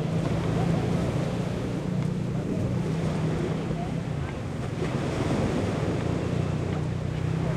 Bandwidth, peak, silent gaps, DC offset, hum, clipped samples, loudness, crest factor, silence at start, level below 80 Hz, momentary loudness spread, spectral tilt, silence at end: 11.5 kHz; -14 dBFS; none; under 0.1%; none; under 0.1%; -28 LUFS; 14 dB; 0 s; -44 dBFS; 4 LU; -7.5 dB/octave; 0 s